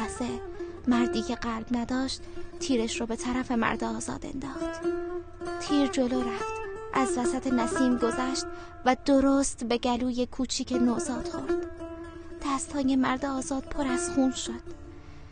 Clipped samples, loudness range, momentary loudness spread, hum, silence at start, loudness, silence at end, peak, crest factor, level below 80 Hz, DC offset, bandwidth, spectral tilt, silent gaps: under 0.1%; 4 LU; 12 LU; none; 0 s; -29 LUFS; 0 s; -10 dBFS; 18 dB; -46 dBFS; under 0.1%; 10 kHz; -4 dB/octave; none